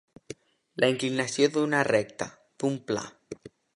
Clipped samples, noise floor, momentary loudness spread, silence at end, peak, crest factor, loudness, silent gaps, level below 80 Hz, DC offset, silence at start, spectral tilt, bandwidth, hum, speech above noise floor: under 0.1%; -47 dBFS; 21 LU; 0.3 s; -8 dBFS; 22 dB; -27 LUFS; none; -68 dBFS; under 0.1%; 0.3 s; -4.5 dB/octave; 11.5 kHz; none; 21 dB